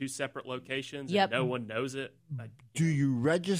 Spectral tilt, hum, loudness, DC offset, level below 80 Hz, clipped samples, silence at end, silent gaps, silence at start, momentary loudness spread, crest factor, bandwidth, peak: -5.5 dB/octave; none; -32 LUFS; under 0.1%; -72 dBFS; under 0.1%; 0 s; none; 0 s; 13 LU; 18 dB; 15.5 kHz; -14 dBFS